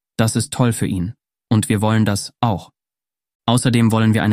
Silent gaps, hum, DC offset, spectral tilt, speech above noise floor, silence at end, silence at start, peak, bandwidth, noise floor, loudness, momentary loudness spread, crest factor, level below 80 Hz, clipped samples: 3.35-3.40 s; none; under 0.1%; -5.5 dB/octave; over 73 dB; 0 s; 0.2 s; 0 dBFS; 15.5 kHz; under -90 dBFS; -18 LUFS; 9 LU; 18 dB; -48 dBFS; under 0.1%